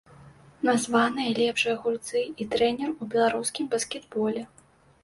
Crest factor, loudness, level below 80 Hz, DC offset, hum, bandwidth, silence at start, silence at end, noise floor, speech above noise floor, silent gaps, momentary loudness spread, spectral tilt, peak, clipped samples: 18 dB; -26 LUFS; -64 dBFS; under 0.1%; none; 11.5 kHz; 0.2 s; 0.55 s; -51 dBFS; 25 dB; none; 6 LU; -3.5 dB/octave; -10 dBFS; under 0.1%